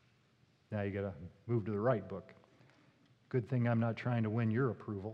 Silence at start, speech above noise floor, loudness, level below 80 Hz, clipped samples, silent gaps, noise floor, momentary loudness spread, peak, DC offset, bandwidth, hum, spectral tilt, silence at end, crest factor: 0.7 s; 35 dB; -36 LUFS; -74 dBFS; under 0.1%; none; -71 dBFS; 10 LU; -20 dBFS; under 0.1%; 5.4 kHz; none; -10 dB/octave; 0 s; 16 dB